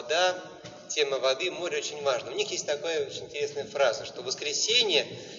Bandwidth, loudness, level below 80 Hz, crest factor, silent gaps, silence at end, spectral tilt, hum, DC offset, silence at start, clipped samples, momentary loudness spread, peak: 7.8 kHz; -28 LUFS; -74 dBFS; 20 dB; none; 0 s; 0 dB/octave; none; under 0.1%; 0 s; under 0.1%; 11 LU; -10 dBFS